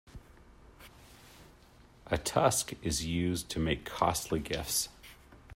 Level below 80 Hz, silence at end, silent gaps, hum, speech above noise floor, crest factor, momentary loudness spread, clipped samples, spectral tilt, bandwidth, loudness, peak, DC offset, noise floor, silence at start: -52 dBFS; 0 s; none; none; 27 dB; 24 dB; 11 LU; under 0.1%; -4 dB/octave; 16 kHz; -32 LUFS; -10 dBFS; under 0.1%; -58 dBFS; 0.15 s